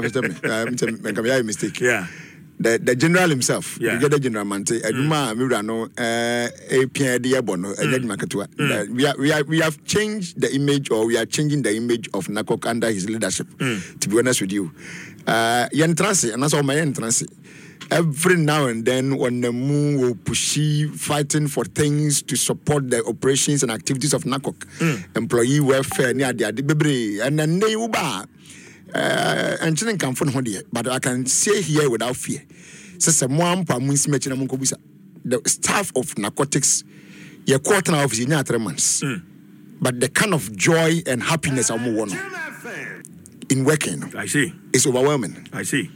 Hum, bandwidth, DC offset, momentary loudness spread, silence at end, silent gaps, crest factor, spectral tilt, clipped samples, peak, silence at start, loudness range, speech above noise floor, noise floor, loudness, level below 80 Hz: none; 17 kHz; under 0.1%; 8 LU; 0.05 s; none; 18 dB; -4 dB/octave; under 0.1%; -4 dBFS; 0 s; 2 LU; 23 dB; -44 dBFS; -20 LUFS; -60 dBFS